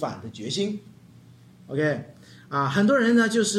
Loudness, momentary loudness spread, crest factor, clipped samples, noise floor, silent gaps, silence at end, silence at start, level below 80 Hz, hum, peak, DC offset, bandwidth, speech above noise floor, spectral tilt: -24 LUFS; 15 LU; 16 dB; under 0.1%; -50 dBFS; none; 0 s; 0 s; -68 dBFS; none; -10 dBFS; under 0.1%; 12.5 kHz; 27 dB; -4.5 dB/octave